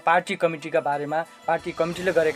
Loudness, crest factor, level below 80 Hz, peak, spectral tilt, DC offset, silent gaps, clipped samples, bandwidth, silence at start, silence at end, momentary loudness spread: -25 LUFS; 18 dB; -60 dBFS; -6 dBFS; -5 dB/octave; under 0.1%; none; under 0.1%; 14.5 kHz; 0.05 s; 0 s; 6 LU